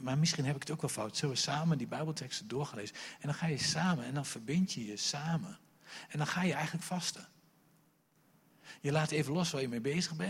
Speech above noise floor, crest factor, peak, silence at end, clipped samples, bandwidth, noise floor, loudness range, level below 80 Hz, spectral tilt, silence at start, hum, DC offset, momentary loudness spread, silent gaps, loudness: 35 dB; 18 dB; -18 dBFS; 0 s; under 0.1%; 16 kHz; -70 dBFS; 3 LU; -72 dBFS; -4.5 dB/octave; 0 s; none; under 0.1%; 11 LU; none; -35 LUFS